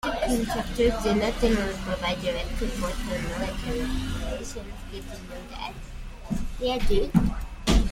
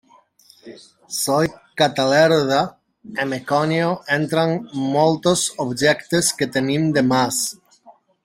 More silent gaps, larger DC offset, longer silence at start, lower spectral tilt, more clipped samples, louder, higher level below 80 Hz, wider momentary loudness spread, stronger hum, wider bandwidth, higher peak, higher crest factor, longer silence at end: neither; neither; second, 0.05 s vs 0.65 s; first, -5.5 dB/octave vs -4 dB/octave; neither; second, -28 LUFS vs -19 LUFS; first, -32 dBFS vs -58 dBFS; first, 15 LU vs 9 LU; neither; about the same, 16.5 kHz vs 16.5 kHz; second, -6 dBFS vs -2 dBFS; about the same, 20 dB vs 18 dB; second, 0 s vs 0.35 s